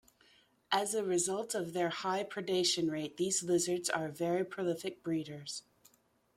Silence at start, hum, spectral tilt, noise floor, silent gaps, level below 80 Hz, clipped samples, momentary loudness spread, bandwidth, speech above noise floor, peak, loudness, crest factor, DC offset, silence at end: 0.7 s; none; -3 dB/octave; -70 dBFS; none; -76 dBFS; under 0.1%; 7 LU; 16 kHz; 36 dB; -16 dBFS; -34 LUFS; 20 dB; under 0.1%; 0.75 s